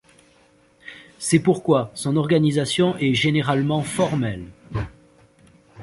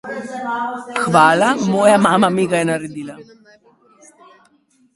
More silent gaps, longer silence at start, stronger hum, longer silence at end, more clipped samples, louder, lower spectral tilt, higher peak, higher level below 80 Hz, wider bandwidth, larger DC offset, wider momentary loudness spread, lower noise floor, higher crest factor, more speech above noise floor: neither; first, 0.85 s vs 0.05 s; neither; second, 0 s vs 1.7 s; neither; second, -21 LUFS vs -15 LUFS; about the same, -5.5 dB/octave vs -5 dB/octave; second, -4 dBFS vs 0 dBFS; first, -50 dBFS vs -58 dBFS; about the same, 11.5 kHz vs 11.5 kHz; neither; about the same, 16 LU vs 16 LU; about the same, -56 dBFS vs -57 dBFS; about the same, 18 dB vs 18 dB; second, 36 dB vs 41 dB